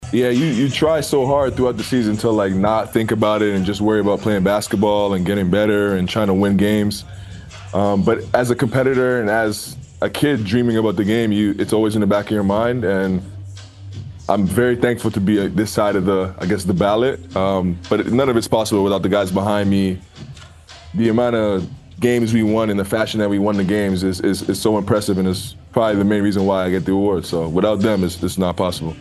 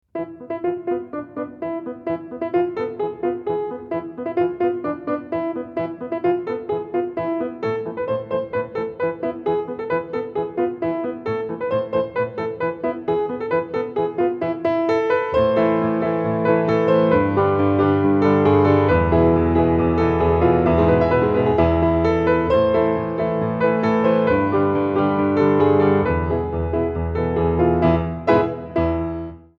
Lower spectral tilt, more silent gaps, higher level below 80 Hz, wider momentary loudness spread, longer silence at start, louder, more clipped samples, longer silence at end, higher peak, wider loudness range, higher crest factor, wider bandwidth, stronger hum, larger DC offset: second, -6 dB/octave vs -9.5 dB/octave; neither; second, -44 dBFS vs -38 dBFS; second, 7 LU vs 10 LU; second, 0 s vs 0.15 s; about the same, -18 LUFS vs -20 LUFS; neither; second, 0 s vs 0.2 s; first, 0 dBFS vs -4 dBFS; second, 2 LU vs 8 LU; about the same, 18 dB vs 16 dB; first, 12.5 kHz vs 6.2 kHz; neither; neither